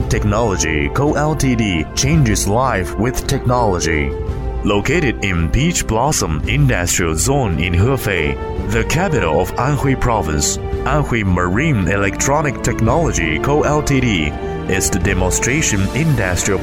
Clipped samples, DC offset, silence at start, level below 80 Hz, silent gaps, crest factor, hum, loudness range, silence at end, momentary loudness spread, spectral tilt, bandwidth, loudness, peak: under 0.1%; under 0.1%; 0 s; -26 dBFS; none; 14 dB; none; 1 LU; 0 s; 4 LU; -4.5 dB/octave; 16.5 kHz; -16 LUFS; -2 dBFS